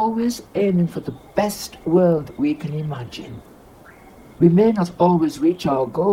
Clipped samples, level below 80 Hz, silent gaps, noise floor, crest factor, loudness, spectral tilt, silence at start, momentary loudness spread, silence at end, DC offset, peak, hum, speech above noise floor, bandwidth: under 0.1%; -52 dBFS; none; -45 dBFS; 18 dB; -20 LUFS; -7.5 dB/octave; 0 s; 15 LU; 0 s; under 0.1%; -2 dBFS; none; 26 dB; 16 kHz